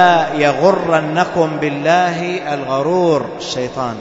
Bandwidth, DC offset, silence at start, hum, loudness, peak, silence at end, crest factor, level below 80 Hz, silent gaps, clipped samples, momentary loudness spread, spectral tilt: 7.8 kHz; under 0.1%; 0 s; none; -16 LUFS; 0 dBFS; 0 s; 14 dB; -52 dBFS; none; under 0.1%; 8 LU; -5.5 dB/octave